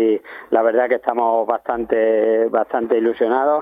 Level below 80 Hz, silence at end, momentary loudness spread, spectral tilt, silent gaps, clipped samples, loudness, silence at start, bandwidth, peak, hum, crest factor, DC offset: -58 dBFS; 0 s; 5 LU; -8 dB/octave; none; under 0.1%; -18 LUFS; 0 s; 3.8 kHz; -2 dBFS; none; 16 dB; under 0.1%